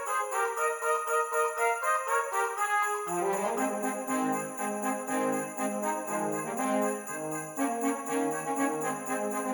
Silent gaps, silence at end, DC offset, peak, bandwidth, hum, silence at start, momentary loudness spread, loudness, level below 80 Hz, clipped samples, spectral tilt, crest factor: none; 0 s; under 0.1%; -16 dBFS; 19 kHz; none; 0 s; 5 LU; -30 LUFS; -78 dBFS; under 0.1%; -3.5 dB/octave; 16 dB